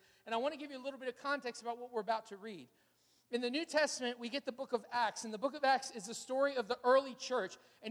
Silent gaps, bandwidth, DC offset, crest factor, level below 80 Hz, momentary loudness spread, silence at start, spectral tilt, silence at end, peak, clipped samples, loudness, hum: none; 15 kHz; under 0.1%; 20 dB; -86 dBFS; 12 LU; 0.25 s; -2.5 dB/octave; 0 s; -18 dBFS; under 0.1%; -37 LUFS; none